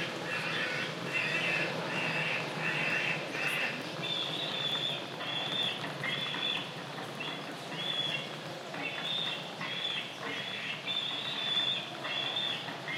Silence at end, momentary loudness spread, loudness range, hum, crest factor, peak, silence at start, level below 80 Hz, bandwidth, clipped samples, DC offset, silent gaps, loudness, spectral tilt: 0 s; 8 LU; 3 LU; none; 18 dB; -18 dBFS; 0 s; -82 dBFS; 16 kHz; under 0.1%; under 0.1%; none; -33 LUFS; -3 dB/octave